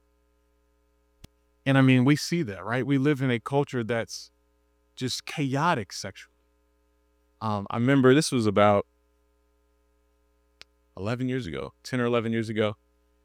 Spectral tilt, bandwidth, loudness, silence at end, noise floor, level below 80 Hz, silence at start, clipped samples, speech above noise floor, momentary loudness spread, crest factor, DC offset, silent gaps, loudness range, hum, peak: -6 dB/octave; 15 kHz; -25 LUFS; 0.5 s; -68 dBFS; -64 dBFS; 1.65 s; under 0.1%; 43 dB; 16 LU; 22 dB; under 0.1%; none; 7 LU; 60 Hz at -55 dBFS; -4 dBFS